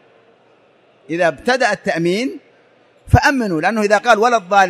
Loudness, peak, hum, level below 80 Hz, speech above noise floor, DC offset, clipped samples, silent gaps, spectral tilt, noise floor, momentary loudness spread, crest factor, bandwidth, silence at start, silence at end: -16 LUFS; 0 dBFS; none; -36 dBFS; 38 dB; under 0.1%; under 0.1%; none; -5.5 dB/octave; -53 dBFS; 8 LU; 16 dB; 15 kHz; 1.1 s; 0 s